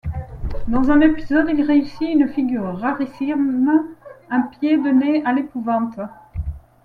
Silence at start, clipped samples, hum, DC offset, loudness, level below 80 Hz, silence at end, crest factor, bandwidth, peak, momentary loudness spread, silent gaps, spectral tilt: 0.05 s; under 0.1%; none; under 0.1%; -19 LUFS; -36 dBFS; 0.25 s; 16 dB; 5 kHz; -2 dBFS; 14 LU; none; -8.5 dB/octave